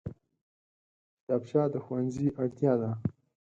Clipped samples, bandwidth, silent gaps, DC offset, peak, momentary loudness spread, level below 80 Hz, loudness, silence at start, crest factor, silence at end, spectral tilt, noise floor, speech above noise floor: under 0.1%; 8 kHz; 0.41-1.27 s; under 0.1%; -12 dBFS; 8 LU; -60 dBFS; -31 LUFS; 0.05 s; 20 dB; 0.35 s; -9.5 dB/octave; under -90 dBFS; over 61 dB